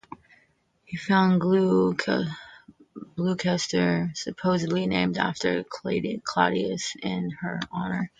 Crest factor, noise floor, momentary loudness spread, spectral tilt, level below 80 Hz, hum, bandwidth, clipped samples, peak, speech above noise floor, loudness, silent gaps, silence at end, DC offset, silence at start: 20 dB; -65 dBFS; 10 LU; -5.5 dB/octave; -60 dBFS; none; 9.2 kHz; under 0.1%; -6 dBFS; 40 dB; -25 LUFS; none; 0.15 s; under 0.1%; 0.9 s